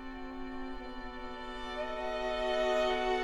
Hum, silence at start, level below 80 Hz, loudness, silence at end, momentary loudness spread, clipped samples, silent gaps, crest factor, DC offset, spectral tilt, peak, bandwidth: none; 0 s; -50 dBFS; -36 LUFS; 0 s; 14 LU; under 0.1%; none; 14 dB; under 0.1%; -4 dB/octave; -20 dBFS; 12 kHz